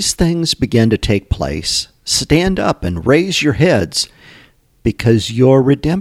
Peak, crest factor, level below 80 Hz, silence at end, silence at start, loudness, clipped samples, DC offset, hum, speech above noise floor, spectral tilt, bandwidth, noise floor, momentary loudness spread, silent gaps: 0 dBFS; 14 dB; -32 dBFS; 0 s; 0 s; -14 LUFS; under 0.1%; under 0.1%; none; 34 dB; -5 dB/octave; 16 kHz; -47 dBFS; 7 LU; none